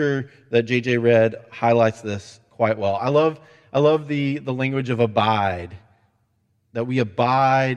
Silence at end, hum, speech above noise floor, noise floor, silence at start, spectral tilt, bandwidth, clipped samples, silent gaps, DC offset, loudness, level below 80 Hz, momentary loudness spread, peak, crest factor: 0 s; none; 47 dB; -67 dBFS; 0 s; -7 dB/octave; 9.6 kHz; under 0.1%; none; under 0.1%; -21 LUFS; -60 dBFS; 12 LU; -2 dBFS; 18 dB